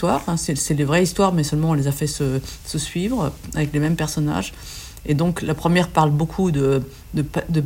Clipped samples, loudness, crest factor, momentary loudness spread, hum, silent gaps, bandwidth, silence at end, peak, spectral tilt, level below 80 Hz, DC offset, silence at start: under 0.1%; -21 LUFS; 18 dB; 8 LU; none; none; 16.5 kHz; 0 s; -2 dBFS; -5.5 dB/octave; -40 dBFS; under 0.1%; 0 s